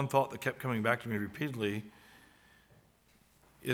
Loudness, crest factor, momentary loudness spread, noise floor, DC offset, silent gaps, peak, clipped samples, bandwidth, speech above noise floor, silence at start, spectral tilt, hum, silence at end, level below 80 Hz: -35 LUFS; 24 dB; 11 LU; -67 dBFS; under 0.1%; none; -12 dBFS; under 0.1%; over 20 kHz; 33 dB; 0 s; -6 dB/octave; none; 0 s; -72 dBFS